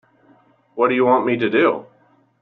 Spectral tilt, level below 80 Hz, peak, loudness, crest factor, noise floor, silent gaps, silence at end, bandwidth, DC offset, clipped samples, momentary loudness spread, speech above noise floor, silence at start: -4 dB/octave; -66 dBFS; -4 dBFS; -18 LUFS; 16 dB; -55 dBFS; none; 0.55 s; 4.4 kHz; under 0.1%; under 0.1%; 11 LU; 38 dB; 0.75 s